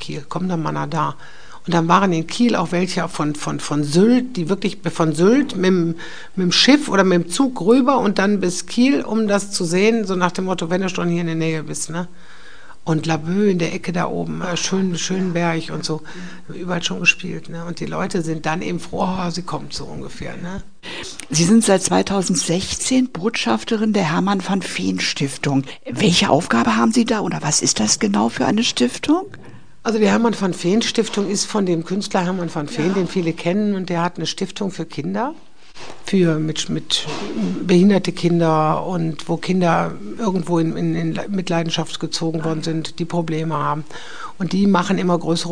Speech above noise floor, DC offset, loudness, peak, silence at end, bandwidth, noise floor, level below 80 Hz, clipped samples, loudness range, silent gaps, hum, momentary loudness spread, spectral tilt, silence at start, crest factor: 25 dB; 3%; -19 LUFS; 0 dBFS; 0 s; 10 kHz; -44 dBFS; -50 dBFS; under 0.1%; 6 LU; none; none; 12 LU; -4.5 dB/octave; 0 s; 20 dB